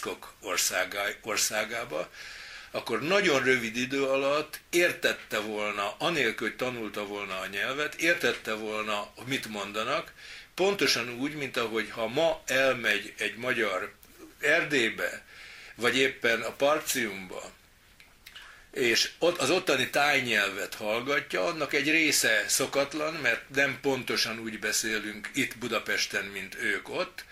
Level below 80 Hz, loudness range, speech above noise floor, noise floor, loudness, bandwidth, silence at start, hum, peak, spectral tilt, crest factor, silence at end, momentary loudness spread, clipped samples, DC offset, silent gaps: -62 dBFS; 4 LU; 28 dB; -57 dBFS; -28 LUFS; 16 kHz; 0 s; none; -10 dBFS; -2 dB/octave; 20 dB; 0 s; 12 LU; under 0.1%; under 0.1%; none